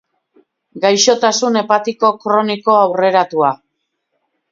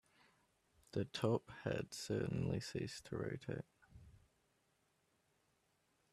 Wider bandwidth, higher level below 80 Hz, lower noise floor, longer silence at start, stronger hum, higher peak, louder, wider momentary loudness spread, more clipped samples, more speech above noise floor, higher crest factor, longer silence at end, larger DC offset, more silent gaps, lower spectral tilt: second, 7.8 kHz vs 14 kHz; about the same, -66 dBFS vs -70 dBFS; second, -71 dBFS vs -80 dBFS; second, 0.75 s vs 0.95 s; neither; first, 0 dBFS vs -22 dBFS; first, -14 LUFS vs -43 LUFS; second, 5 LU vs 8 LU; neither; first, 58 dB vs 38 dB; second, 16 dB vs 24 dB; second, 0.95 s vs 2 s; neither; neither; second, -3 dB/octave vs -6 dB/octave